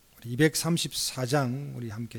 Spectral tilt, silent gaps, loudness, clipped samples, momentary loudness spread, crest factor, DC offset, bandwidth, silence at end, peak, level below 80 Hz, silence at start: -4.5 dB/octave; none; -28 LUFS; under 0.1%; 12 LU; 18 dB; under 0.1%; 19 kHz; 0 s; -10 dBFS; -60 dBFS; 0.2 s